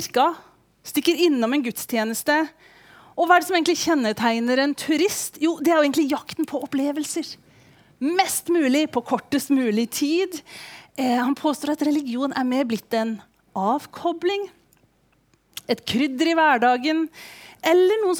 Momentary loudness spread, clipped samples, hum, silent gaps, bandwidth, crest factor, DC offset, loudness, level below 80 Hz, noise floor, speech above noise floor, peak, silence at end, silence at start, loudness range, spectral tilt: 13 LU; under 0.1%; none; none; over 20 kHz; 18 dB; under 0.1%; -22 LUFS; -68 dBFS; -62 dBFS; 41 dB; -4 dBFS; 0 s; 0 s; 4 LU; -3 dB/octave